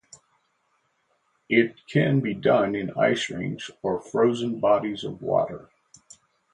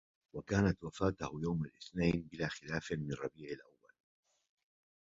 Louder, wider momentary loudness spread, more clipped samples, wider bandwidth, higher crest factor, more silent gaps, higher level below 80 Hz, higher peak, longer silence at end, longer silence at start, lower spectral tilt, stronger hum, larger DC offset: first, -24 LUFS vs -38 LUFS; second, 9 LU vs 14 LU; neither; first, 10.5 kHz vs 7.6 kHz; about the same, 20 dB vs 24 dB; neither; second, -62 dBFS vs -56 dBFS; first, -6 dBFS vs -16 dBFS; second, 0.9 s vs 1.5 s; first, 1.5 s vs 0.35 s; about the same, -6.5 dB/octave vs -6 dB/octave; neither; neither